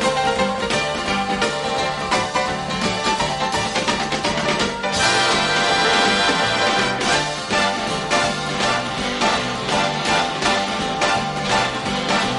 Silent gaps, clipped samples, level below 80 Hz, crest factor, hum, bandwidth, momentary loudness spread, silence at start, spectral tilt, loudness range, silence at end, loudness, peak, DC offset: none; under 0.1%; -44 dBFS; 16 dB; none; 11.5 kHz; 5 LU; 0 s; -3 dB/octave; 3 LU; 0 s; -19 LUFS; -4 dBFS; under 0.1%